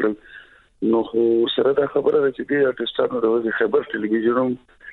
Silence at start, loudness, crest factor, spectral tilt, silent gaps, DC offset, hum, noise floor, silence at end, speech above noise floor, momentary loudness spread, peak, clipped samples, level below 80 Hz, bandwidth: 0 s; -20 LUFS; 16 dB; -8 dB/octave; none; under 0.1%; none; -46 dBFS; 0 s; 26 dB; 6 LU; -4 dBFS; under 0.1%; -60 dBFS; 4.2 kHz